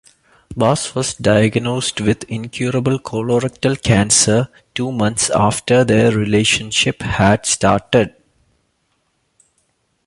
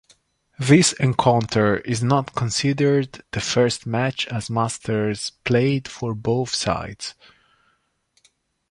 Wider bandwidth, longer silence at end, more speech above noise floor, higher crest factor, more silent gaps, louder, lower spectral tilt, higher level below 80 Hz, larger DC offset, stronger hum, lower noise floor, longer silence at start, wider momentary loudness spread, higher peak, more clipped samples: about the same, 11.5 kHz vs 11.5 kHz; first, 1.95 s vs 1.6 s; about the same, 50 dB vs 47 dB; about the same, 16 dB vs 20 dB; neither; first, -16 LUFS vs -21 LUFS; about the same, -4 dB/octave vs -5 dB/octave; first, -42 dBFS vs -50 dBFS; neither; neither; about the same, -65 dBFS vs -67 dBFS; about the same, 0.5 s vs 0.6 s; about the same, 9 LU vs 10 LU; about the same, 0 dBFS vs -2 dBFS; neither